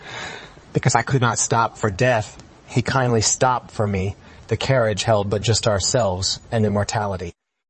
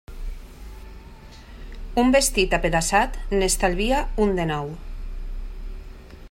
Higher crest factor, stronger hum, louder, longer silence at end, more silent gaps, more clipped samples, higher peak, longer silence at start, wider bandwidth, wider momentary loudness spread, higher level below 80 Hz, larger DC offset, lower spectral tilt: about the same, 18 dB vs 20 dB; neither; about the same, -20 LUFS vs -21 LUFS; first, 0.4 s vs 0.05 s; neither; neither; about the same, -2 dBFS vs -4 dBFS; about the same, 0 s vs 0.1 s; second, 8.8 kHz vs 16 kHz; second, 13 LU vs 24 LU; second, -48 dBFS vs -32 dBFS; neither; about the same, -4 dB/octave vs -3.5 dB/octave